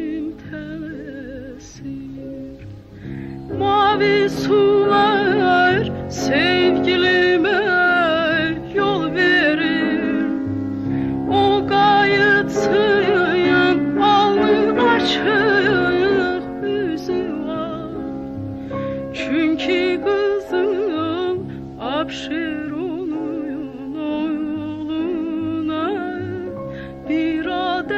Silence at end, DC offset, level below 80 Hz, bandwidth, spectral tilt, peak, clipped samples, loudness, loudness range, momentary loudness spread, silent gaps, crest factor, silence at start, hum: 0 s; under 0.1%; -46 dBFS; 8.2 kHz; -5.5 dB/octave; -6 dBFS; under 0.1%; -18 LUFS; 9 LU; 16 LU; none; 14 dB; 0 s; none